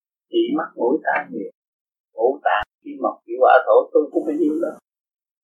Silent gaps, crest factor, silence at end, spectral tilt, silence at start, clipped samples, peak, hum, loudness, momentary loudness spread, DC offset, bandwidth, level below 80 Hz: 1.54-1.62 s, 1.68-1.86 s, 2.00-2.04 s; 20 dB; 0.7 s; -6.5 dB/octave; 0.3 s; under 0.1%; 0 dBFS; none; -20 LUFS; 16 LU; under 0.1%; 4.7 kHz; -62 dBFS